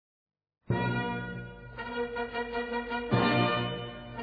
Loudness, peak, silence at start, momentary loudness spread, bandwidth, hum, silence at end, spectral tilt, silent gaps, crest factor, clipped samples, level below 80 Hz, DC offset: -31 LUFS; -14 dBFS; 0.7 s; 14 LU; 5 kHz; none; 0 s; -9 dB/octave; none; 20 dB; under 0.1%; -54 dBFS; under 0.1%